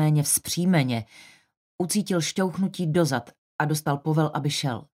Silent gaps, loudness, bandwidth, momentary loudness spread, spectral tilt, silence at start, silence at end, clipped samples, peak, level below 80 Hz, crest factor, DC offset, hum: 1.57-1.78 s, 3.38-3.59 s; -25 LUFS; 16 kHz; 9 LU; -5 dB/octave; 0 s; 0.1 s; under 0.1%; -8 dBFS; -64 dBFS; 16 dB; under 0.1%; none